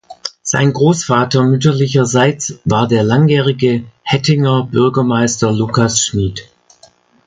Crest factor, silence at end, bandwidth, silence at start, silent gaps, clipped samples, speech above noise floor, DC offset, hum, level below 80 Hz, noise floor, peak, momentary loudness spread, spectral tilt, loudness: 14 dB; 0.85 s; 9.6 kHz; 0.1 s; none; under 0.1%; 36 dB; under 0.1%; none; -42 dBFS; -48 dBFS; 0 dBFS; 7 LU; -5 dB/octave; -13 LUFS